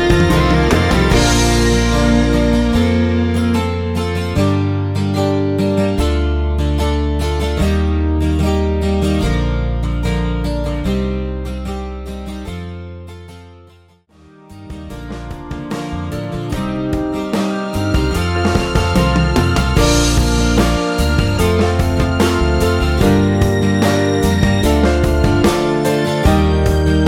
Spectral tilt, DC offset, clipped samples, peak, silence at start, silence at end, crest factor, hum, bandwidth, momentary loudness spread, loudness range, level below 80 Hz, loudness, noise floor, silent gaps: -6 dB/octave; under 0.1%; under 0.1%; 0 dBFS; 0 s; 0 s; 14 dB; none; 16.5 kHz; 12 LU; 13 LU; -20 dBFS; -15 LUFS; -48 dBFS; none